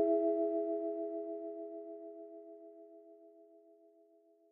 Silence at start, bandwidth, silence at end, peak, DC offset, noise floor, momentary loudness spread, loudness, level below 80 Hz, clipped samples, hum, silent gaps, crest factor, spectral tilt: 0 s; 2.6 kHz; 0.9 s; -20 dBFS; under 0.1%; -67 dBFS; 25 LU; -38 LUFS; under -90 dBFS; under 0.1%; none; none; 18 dB; -7.5 dB/octave